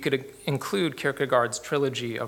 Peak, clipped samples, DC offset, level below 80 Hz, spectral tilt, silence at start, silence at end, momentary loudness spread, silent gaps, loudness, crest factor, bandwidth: -8 dBFS; under 0.1%; under 0.1%; -66 dBFS; -4.5 dB/octave; 0 s; 0 s; 6 LU; none; -27 LUFS; 20 dB; 17.5 kHz